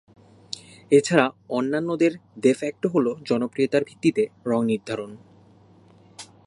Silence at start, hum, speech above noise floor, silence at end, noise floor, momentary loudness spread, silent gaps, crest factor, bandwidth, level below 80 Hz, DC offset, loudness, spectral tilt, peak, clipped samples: 0.5 s; none; 31 dB; 0.2 s; -53 dBFS; 17 LU; none; 22 dB; 11.5 kHz; -68 dBFS; under 0.1%; -23 LUFS; -5.5 dB/octave; -2 dBFS; under 0.1%